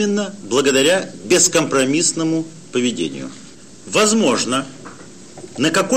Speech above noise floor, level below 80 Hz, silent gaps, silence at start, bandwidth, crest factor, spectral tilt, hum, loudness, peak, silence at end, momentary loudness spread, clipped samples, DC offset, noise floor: 22 dB; -60 dBFS; none; 0 s; 16 kHz; 16 dB; -3 dB/octave; none; -17 LUFS; -2 dBFS; 0 s; 19 LU; under 0.1%; 0.6%; -39 dBFS